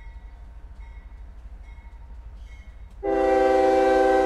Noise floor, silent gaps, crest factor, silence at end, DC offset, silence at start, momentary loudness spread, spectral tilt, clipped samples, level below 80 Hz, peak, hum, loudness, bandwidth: -42 dBFS; none; 16 dB; 0 s; under 0.1%; 0 s; 26 LU; -6 dB/octave; under 0.1%; -42 dBFS; -8 dBFS; none; -20 LUFS; 11.5 kHz